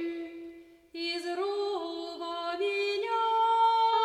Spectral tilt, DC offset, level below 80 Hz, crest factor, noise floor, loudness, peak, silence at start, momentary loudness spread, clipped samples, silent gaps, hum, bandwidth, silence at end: -2 dB/octave; under 0.1%; -76 dBFS; 14 dB; -50 dBFS; -30 LUFS; -16 dBFS; 0 s; 17 LU; under 0.1%; none; none; 11.5 kHz; 0 s